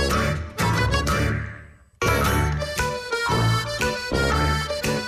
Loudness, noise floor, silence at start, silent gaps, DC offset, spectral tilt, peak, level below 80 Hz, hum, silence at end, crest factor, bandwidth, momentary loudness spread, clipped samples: -23 LUFS; -43 dBFS; 0 s; none; under 0.1%; -4.5 dB/octave; -10 dBFS; -32 dBFS; none; 0 s; 12 dB; 15.5 kHz; 5 LU; under 0.1%